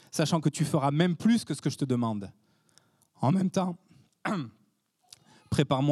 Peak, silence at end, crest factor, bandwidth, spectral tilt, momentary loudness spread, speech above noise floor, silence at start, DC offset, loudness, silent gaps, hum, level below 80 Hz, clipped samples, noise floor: -10 dBFS; 0 s; 18 dB; 13.5 kHz; -6 dB/octave; 12 LU; 43 dB; 0.15 s; under 0.1%; -29 LUFS; none; none; -66 dBFS; under 0.1%; -70 dBFS